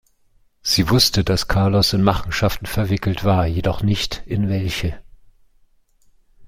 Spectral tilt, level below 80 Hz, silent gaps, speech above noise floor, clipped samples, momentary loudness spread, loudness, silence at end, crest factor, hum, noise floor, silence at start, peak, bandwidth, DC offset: -5 dB/octave; -34 dBFS; none; 39 dB; under 0.1%; 8 LU; -19 LUFS; 0 s; 18 dB; none; -57 dBFS; 0.65 s; -2 dBFS; 16.5 kHz; under 0.1%